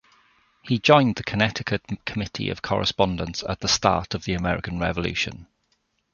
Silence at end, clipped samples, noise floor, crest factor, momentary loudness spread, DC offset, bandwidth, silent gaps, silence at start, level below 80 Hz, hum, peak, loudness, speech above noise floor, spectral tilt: 0.7 s; under 0.1%; -70 dBFS; 22 dB; 11 LU; under 0.1%; 7.2 kHz; none; 0.65 s; -44 dBFS; none; -2 dBFS; -23 LUFS; 47 dB; -4.5 dB/octave